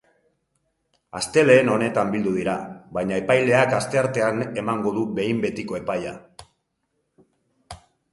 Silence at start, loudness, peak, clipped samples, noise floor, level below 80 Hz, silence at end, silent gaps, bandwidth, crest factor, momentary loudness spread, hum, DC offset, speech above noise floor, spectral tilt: 1.15 s; -22 LUFS; -2 dBFS; under 0.1%; -74 dBFS; -58 dBFS; 0.35 s; none; 11.5 kHz; 20 dB; 14 LU; none; under 0.1%; 53 dB; -5.5 dB/octave